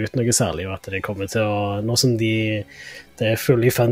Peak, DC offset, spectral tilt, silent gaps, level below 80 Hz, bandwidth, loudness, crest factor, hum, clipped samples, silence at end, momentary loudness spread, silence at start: -4 dBFS; under 0.1%; -4.5 dB/octave; none; -50 dBFS; 16 kHz; -21 LUFS; 18 dB; none; under 0.1%; 0 s; 11 LU; 0 s